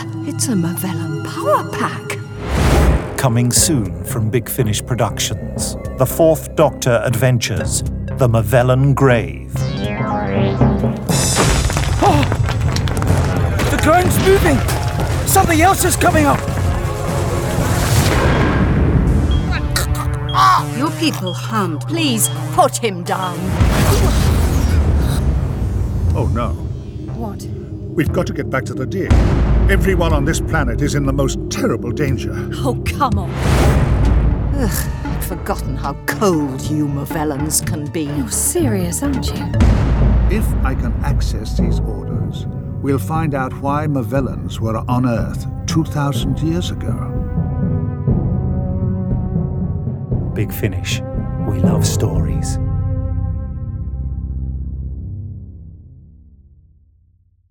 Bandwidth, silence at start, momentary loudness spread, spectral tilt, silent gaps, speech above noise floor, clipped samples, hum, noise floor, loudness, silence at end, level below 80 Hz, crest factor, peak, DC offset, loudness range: 20 kHz; 0 s; 9 LU; -5.5 dB/octave; none; 39 dB; under 0.1%; none; -55 dBFS; -17 LUFS; 1.5 s; -22 dBFS; 16 dB; 0 dBFS; under 0.1%; 5 LU